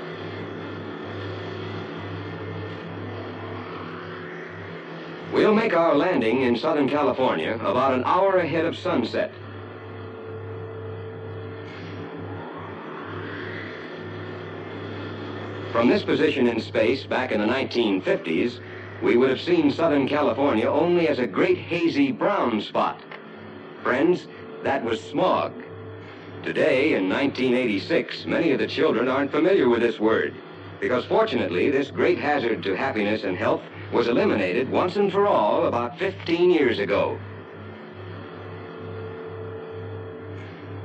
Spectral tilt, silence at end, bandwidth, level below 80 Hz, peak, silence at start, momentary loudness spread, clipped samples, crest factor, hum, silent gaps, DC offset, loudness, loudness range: -7 dB/octave; 0 s; 8.6 kHz; -66 dBFS; -8 dBFS; 0 s; 17 LU; under 0.1%; 16 dB; none; none; under 0.1%; -23 LUFS; 13 LU